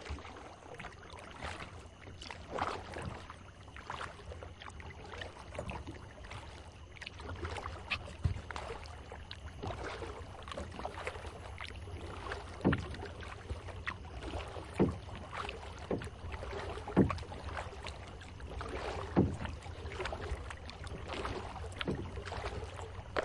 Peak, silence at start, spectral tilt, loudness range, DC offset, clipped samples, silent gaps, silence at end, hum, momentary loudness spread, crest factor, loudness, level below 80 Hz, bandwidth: -14 dBFS; 0 s; -6 dB/octave; 8 LU; under 0.1%; under 0.1%; none; 0 s; none; 14 LU; 26 dB; -41 LUFS; -50 dBFS; 11.5 kHz